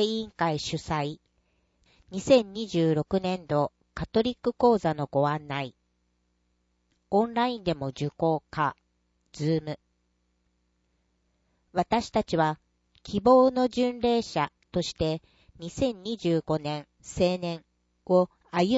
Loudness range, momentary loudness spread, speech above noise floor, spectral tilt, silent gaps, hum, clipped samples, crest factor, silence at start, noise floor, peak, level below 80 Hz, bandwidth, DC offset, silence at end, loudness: 6 LU; 13 LU; 47 dB; -6 dB/octave; none; 60 Hz at -60 dBFS; under 0.1%; 20 dB; 0 s; -73 dBFS; -8 dBFS; -54 dBFS; 8 kHz; under 0.1%; 0 s; -27 LUFS